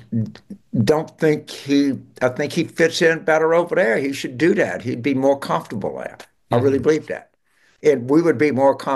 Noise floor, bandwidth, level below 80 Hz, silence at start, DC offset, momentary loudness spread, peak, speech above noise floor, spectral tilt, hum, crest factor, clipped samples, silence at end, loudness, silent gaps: -60 dBFS; 12.5 kHz; -60 dBFS; 0.1 s; under 0.1%; 10 LU; -4 dBFS; 42 dB; -6 dB/octave; none; 14 dB; under 0.1%; 0 s; -19 LUFS; none